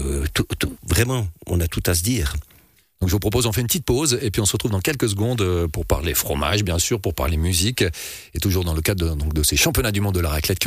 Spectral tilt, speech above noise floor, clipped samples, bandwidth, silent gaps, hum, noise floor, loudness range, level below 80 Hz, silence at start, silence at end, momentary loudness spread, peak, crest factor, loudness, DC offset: -4 dB/octave; 34 dB; under 0.1%; 15.5 kHz; none; none; -54 dBFS; 1 LU; -30 dBFS; 0 s; 0 s; 5 LU; -6 dBFS; 16 dB; -21 LUFS; under 0.1%